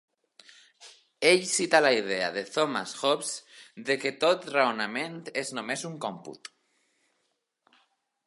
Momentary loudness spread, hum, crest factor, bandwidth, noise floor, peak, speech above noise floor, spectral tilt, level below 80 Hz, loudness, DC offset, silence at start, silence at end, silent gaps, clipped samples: 17 LU; none; 24 dB; 11.5 kHz; -78 dBFS; -4 dBFS; 50 dB; -2.5 dB/octave; -80 dBFS; -27 LUFS; under 0.1%; 0.8 s; 1.8 s; none; under 0.1%